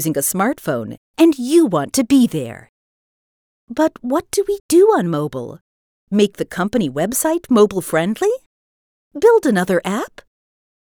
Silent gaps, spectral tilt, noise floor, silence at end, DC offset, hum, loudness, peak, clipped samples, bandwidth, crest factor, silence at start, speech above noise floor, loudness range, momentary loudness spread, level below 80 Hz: 0.97-1.14 s, 2.69-3.67 s, 4.60-4.69 s, 5.61-6.07 s, 8.46-9.11 s; -5 dB/octave; under -90 dBFS; 0.75 s; under 0.1%; none; -17 LUFS; -2 dBFS; under 0.1%; over 20 kHz; 16 dB; 0 s; over 74 dB; 2 LU; 13 LU; -54 dBFS